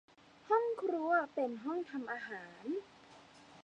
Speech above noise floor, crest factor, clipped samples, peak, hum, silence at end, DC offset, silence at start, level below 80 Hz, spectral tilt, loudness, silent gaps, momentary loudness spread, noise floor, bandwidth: 19 dB; 18 dB; under 0.1%; -20 dBFS; none; 0 s; under 0.1%; 0.45 s; -84 dBFS; -5.5 dB/octave; -37 LUFS; none; 10 LU; -59 dBFS; 9 kHz